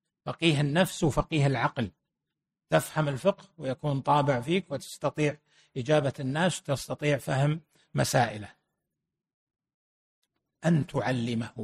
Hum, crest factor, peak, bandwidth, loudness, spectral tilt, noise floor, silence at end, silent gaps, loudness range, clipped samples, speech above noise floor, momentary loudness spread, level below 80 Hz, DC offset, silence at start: none; 20 dB; -10 dBFS; 14 kHz; -28 LUFS; -5.5 dB/octave; -87 dBFS; 0 s; 9.34-9.47 s, 9.74-10.22 s; 4 LU; under 0.1%; 60 dB; 11 LU; -54 dBFS; under 0.1%; 0.25 s